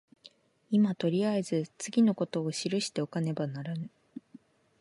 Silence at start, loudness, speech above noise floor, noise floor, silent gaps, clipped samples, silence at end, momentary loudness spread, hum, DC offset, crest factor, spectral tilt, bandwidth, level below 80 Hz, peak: 0.25 s; -30 LUFS; 30 dB; -59 dBFS; none; under 0.1%; 0.6 s; 14 LU; none; under 0.1%; 16 dB; -6 dB/octave; 11.5 kHz; -78 dBFS; -16 dBFS